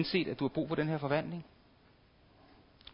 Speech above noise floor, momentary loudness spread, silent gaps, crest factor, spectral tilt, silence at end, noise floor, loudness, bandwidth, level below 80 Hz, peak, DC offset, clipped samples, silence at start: 30 dB; 13 LU; none; 20 dB; -5 dB/octave; 0 s; -64 dBFS; -35 LUFS; 5.4 kHz; -66 dBFS; -18 dBFS; under 0.1%; under 0.1%; 0 s